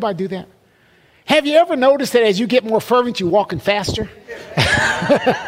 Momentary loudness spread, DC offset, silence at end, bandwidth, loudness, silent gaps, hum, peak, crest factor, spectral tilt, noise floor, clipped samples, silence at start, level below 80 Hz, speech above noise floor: 12 LU; under 0.1%; 0 s; 16 kHz; -16 LUFS; none; none; -2 dBFS; 16 dB; -4.5 dB/octave; -53 dBFS; under 0.1%; 0 s; -44 dBFS; 37 dB